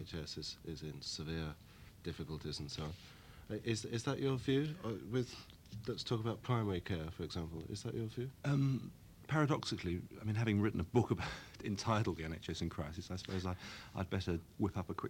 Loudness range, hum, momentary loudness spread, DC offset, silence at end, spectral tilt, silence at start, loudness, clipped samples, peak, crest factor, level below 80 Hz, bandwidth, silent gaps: 6 LU; none; 12 LU; under 0.1%; 0 s; -6 dB/octave; 0 s; -40 LUFS; under 0.1%; -18 dBFS; 22 dB; -58 dBFS; 16.5 kHz; none